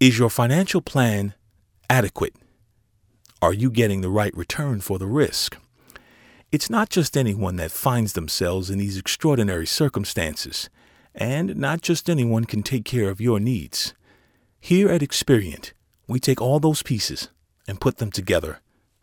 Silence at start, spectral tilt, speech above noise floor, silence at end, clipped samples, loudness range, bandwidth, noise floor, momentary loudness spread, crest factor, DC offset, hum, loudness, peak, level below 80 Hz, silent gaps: 0 s; -5 dB/octave; 42 dB; 0.45 s; under 0.1%; 2 LU; 20 kHz; -63 dBFS; 10 LU; 20 dB; under 0.1%; none; -22 LUFS; -2 dBFS; -48 dBFS; none